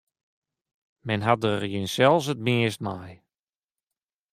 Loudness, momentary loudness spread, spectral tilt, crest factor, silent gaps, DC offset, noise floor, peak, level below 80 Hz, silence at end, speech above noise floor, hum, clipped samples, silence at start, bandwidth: -24 LUFS; 13 LU; -5.5 dB/octave; 22 dB; none; under 0.1%; under -90 dBFS; -4 dBFS; -66 dBFS; 1.2 s; over 66 dB; none; under 0.1%; 1.05 s; 15.5 kHz